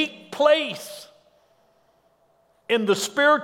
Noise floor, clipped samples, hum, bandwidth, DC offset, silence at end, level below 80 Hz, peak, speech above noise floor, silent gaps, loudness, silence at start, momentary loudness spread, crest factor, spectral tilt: -63 dBFS; under 0.1%; none; 16.5 kHz; under 0.1%; 0 s; -80 dBFS; -4 dBFS; 42 dB; none; -22 LUFS; 0 s; 20 LU; 20 dB; -3 dB/octave